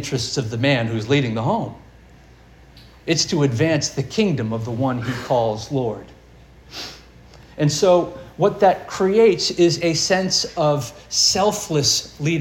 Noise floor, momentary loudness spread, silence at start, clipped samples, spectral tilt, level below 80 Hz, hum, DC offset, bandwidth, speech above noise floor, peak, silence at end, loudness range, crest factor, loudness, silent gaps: -47 dBFS; 10 LU; 0 s; under 0.1%; -4 dB/octave; -50 dBFS; none; under 0.1%; 17 kHz; 28 dB; -2 dBFS; 0 s; 6 LU; 18 dB; -19 LUFS; none